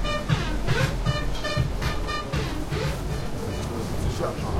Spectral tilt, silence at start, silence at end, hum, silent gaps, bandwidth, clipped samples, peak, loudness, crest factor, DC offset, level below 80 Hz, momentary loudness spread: -5.5 dB/octave; 0 s; 0 s; none; none; 16 kHz; under 0.1%; -10 dBFS; -28 LUFS; 16 dB; under 0.1%; -32 dBFS; 5 LU